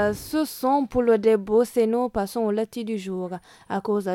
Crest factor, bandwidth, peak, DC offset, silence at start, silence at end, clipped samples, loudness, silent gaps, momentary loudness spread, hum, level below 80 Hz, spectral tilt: 16 dB; 17 kHz; -8 dBFS; under 0.1%; 0 s; 0 s; under 0.1%; -24 LUFS; none; 11 LU; none; -52 dBFS; -6 dB/octave